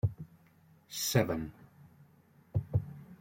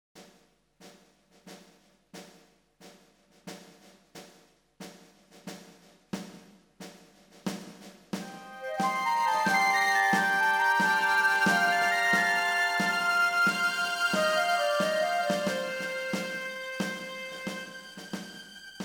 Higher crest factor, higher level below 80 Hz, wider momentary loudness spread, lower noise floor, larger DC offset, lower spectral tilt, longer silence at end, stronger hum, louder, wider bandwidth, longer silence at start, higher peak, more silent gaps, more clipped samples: first, 24 dB vs 18 dB; first, -56 dBFS vs -72 dBFS; second, 19 LU vs 24 LU; about the same, -63 dBFS vs -64 dBFS; neither; first, -5 dB/octave vs -3 dB/octave; about the same, 0.05 s vs 0 s; neither; second, -34 LUFS vs -26 LUFS; second, 16.5 kHz vs 19 kHz; about the same, 0.05 s vs 0.15 s; about the same, -12 dBFS vs -12 dBFS; neither; neither